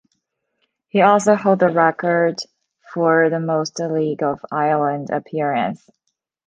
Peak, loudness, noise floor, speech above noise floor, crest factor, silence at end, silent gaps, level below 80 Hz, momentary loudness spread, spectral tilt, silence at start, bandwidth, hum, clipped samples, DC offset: -2 dBFS; -18 LUFS; -73 dBFS; 55 dB; 18 dB; 0.7 s; none; -66 dBFS; 10 LU; -6 dB/octave; 0.95 s; 9.8 kHz; none; under 0.1%; under 0.1%